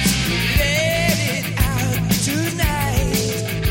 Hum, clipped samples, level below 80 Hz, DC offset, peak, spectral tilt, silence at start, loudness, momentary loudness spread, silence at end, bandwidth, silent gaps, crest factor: none; under 0.1%; -28 dBFS; under 0.1%; -4 dBFS; -4 dB/octave; 0 s; -19 LUFS; 3 LU; 0 s; 17 kHz; none; 16 dB